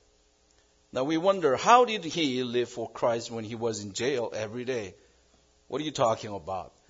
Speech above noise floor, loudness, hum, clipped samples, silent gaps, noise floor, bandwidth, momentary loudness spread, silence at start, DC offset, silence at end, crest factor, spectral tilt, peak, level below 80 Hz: 37 dB; -28 LUFS; none; under 0.1%; none; -65 dBFS; 7.8 kHz; 15 LU; 0.95 s; under 0.1%; 0.2 s; 22 dB; -4 dB/octave; -6 dBFS; -66 dBFS